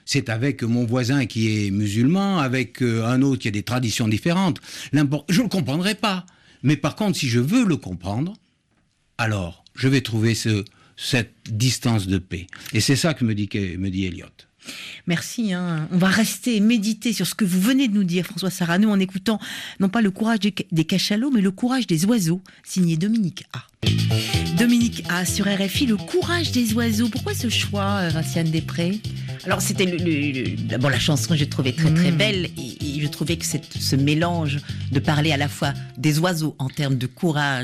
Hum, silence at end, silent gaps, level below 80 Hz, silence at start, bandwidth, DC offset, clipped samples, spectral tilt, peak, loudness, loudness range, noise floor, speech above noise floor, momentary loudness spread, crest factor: none; 0 s; none; -52 dBFS; 0.05 s; 14.5 kHz; under 0.1%; under 0.1%; -5 dB/octave; -8 dBFS; -22 LUFS; 3 LU; -65 dBFS; 44 dB; 8 LU; 14 dB